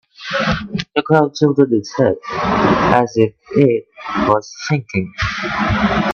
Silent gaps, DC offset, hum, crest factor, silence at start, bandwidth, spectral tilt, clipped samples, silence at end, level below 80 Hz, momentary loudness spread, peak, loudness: none; under 0.1%; none; 16 dB; 0.2 s; 7.2 kHz; -6.5 dB/octave; under 0.1%; 0 s; -38 dBFS; 7 LU; 0 dBFS; -16 LUFS